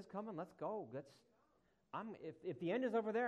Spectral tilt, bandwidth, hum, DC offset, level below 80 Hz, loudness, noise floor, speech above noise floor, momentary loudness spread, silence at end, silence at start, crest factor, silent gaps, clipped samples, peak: -7.5 dB/octave; 9.6 kHz; none; under 0.1%; -88 dBFS; -45 LUFS; -79 dBFS; 35 dB; 13 LU; 0 s; 0 s; 16 dB; none; under 0.1%; -28 dBFS